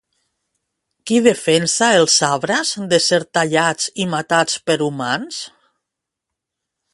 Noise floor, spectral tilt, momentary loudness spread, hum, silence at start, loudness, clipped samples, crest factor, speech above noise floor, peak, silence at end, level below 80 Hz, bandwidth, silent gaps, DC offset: -82 dBFS; -3 dB/octave; 9 LU; none; 1.05 s; -16 LUFS; under 0.1%; 18 dB; 65 dB; 0 dBFS; 1.45 s; -62 dBFS; 11.5 kHz; none; under 0.1%